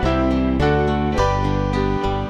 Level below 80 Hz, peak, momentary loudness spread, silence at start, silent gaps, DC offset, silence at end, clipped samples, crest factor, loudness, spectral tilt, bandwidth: -26 dBFS; -6 dBFS; 3 LU; 0 s; none; under 0.1%; 0 s; under 0.1%; 14 dB; -19 LUFS; -7 dB/octave; 10 kHz